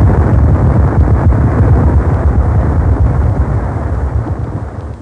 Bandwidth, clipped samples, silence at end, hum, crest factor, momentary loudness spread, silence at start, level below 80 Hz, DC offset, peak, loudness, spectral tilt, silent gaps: 2.8 kHz; under 0.1%; 0 s; none; 10 dB; 8 LU; 0 s; -14 dBFS; under 0.1%; 0 dBFS; -12 LUFS; -10.5 dB/octave; none